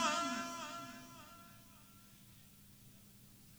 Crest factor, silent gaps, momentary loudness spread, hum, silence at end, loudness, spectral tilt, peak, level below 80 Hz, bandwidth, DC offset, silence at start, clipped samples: 22 dB; none; 20 LU; none; 0 s; -43 LUFS; -2 dB/octave; -22 dBFS; -74 dBFS; over 20 kHz; under 0.1%; 0 s; under 0.1%